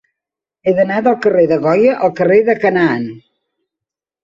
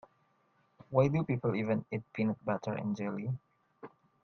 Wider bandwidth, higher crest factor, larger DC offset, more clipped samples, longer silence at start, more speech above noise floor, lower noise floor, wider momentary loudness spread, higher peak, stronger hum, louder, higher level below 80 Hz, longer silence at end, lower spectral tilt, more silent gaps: first, 7.4 kHz vs 6.6 kHz; second, 14 dB vs 22 dB; neither; neither; second, 0.65 s vs 0.9 s; first, 72 dB vs 39 dB; first, -84 dBFS vs -72 dBFS; second, 7 LU vs 23 LU; first, -2 dBFS vs -12 dBFS; neither; first, -13 LUFS vs -34 LUFS; first, -56 dBFS vs -70 dBFS; first, 1.05 s vs 0.35 s; about the same, -8 dB/octave vs -9 dB/octave; neither